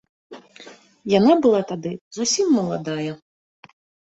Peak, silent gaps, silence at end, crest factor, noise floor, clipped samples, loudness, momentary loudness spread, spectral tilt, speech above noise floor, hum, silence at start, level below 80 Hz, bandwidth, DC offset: -4 dBFS; 2.01-2.11 s; 0.95 s; 18 dB; -46 dBFS; under 0.1%; -20 LUFS; 18 LU; -4.5 dB/octave; 26 dB; none; 0.3 s; -62 dBFS; 8.2 kHz; under 0.1%